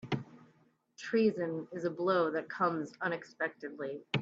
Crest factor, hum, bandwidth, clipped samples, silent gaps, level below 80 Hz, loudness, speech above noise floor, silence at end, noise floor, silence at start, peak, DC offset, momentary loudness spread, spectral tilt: 18 dB; none; 8 kHz; under 0.1%; none; -78 dBFS; -34 LUFS; 35 dB; 0 s; -69 dBFS; 0.05 s; -16 dBFS; under 0.1%; 11 LU; -6.5 dB/octave